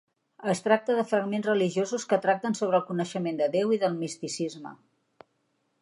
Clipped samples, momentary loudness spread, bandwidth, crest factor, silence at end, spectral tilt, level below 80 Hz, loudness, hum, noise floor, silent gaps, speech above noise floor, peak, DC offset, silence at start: under 0.1%; 8 LU; 11.5 kHz; 20 dB; 1.05 s; -5 dB/octave; -80 dBFS; -27 LUFS; none; -74 dBFS; none; 47 dB; -6 dBFS; under 0.1%; 0.4 s